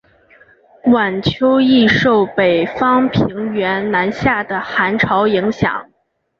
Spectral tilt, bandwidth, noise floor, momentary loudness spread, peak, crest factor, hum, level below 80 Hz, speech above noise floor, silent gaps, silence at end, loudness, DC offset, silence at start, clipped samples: -7 dB/octave; 6.8 kHz; -48 dBFS; 8 LU; -2 dBFS; 14 dB; none; -44 dBFS; 34 dB; none; 0.55 s; -15 LUFS; under 0.1%; 0.85 s; under 0.1%